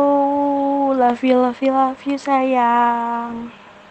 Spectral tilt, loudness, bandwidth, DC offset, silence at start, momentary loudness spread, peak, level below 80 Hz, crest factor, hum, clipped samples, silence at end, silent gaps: -5.5 dB/octave; -17 LUFS; 8.4 kHz; under 0.1%; 0 s; 9 LU; -4 dBFS; -62 dBFS; 14 dB; none; under 0.1%; 0.4 s; none